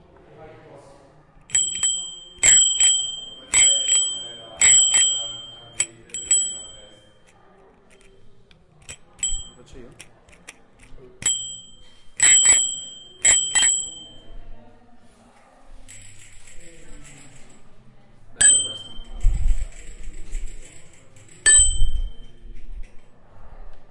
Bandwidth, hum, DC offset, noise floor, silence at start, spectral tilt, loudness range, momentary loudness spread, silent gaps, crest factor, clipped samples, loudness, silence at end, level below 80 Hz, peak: 11.5 kHz; none; under 0.1%; -52 dBFS; 0.4 s; 1.5 dB/octave; 16 LU; 25 LU; none; 20 dB; under 0.1%; -17 LUFS; 0 s; -32 dBFS; -2 dBFS